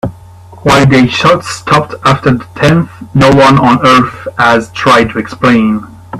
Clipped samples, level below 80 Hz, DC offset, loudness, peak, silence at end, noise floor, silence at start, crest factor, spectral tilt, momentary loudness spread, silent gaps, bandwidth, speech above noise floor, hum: 0.3%; -36 dBFS; under 0.1%; -8 LUFS; 0 dBFS; 0 s; -33 dBFS; 0.05 s; 8 dB; -6 dB/octave; 9 LU; none; 14 kHz; 25 dB; none